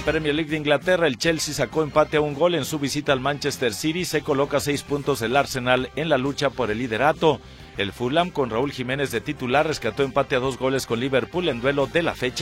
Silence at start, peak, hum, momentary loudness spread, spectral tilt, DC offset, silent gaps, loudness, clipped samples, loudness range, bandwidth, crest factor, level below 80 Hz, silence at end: 0 s; -4 dBFS; none; 5 LU; -4.5 dB/octave; under 0.1%; none; -23 LUFS; under 0.1%; 2 LU; 16.5 kHz; 20 dB; -46 dBFS; 0 s